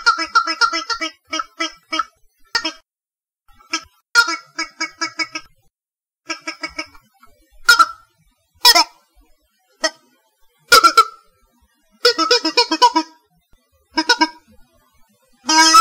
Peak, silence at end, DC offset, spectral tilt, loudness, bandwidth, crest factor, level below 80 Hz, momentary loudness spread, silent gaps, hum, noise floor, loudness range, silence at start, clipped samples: 0 dBFS; 0 s; under 0.1%; 1 dB/octave; -16 LUFS; 17.5 kHz; 20 dB; -56 dBFS; 17 LU; none; none; under -90 dBFS; 7 LU; 0 s; under 0.1%